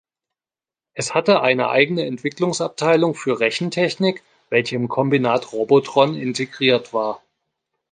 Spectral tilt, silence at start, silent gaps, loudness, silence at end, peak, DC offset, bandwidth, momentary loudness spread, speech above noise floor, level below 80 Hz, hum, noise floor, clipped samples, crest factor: -5 dB/octave; 0.95 s; none; -19 LUFS; 0.75 s; -2 dBFS; under 0.1%; 9.8 kHz; 8 LU; over 71 dB; -66 dBFS; none; under -90 dBFS; under 0.1%; 18 dB